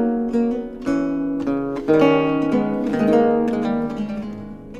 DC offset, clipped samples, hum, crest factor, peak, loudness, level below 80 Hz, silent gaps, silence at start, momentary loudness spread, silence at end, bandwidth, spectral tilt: under 0.1%; under 0.1%; none; 16 dB; -4 dBFS; -20 LUFS; -46 dBFS; none; 0 s; 10 LU; 0 s; 8.2 kHz; -8 dB/octave